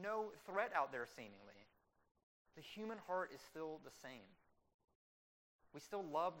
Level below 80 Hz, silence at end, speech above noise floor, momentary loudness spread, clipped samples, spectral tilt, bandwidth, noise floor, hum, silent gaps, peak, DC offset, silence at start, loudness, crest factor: -86 dBFS; 0 s; over 43 dB; 19 LU; under 0.1%; -4.5 dB/octave; 16 kHz; under -90 dBFS; none; 2.11-2.15 s, 2.23-2.45 s, 4.74-4.88 s, 4.95-5.59 s; -26 dBFS; under 0.1%; 0 s; -47 LUFS; 22 dB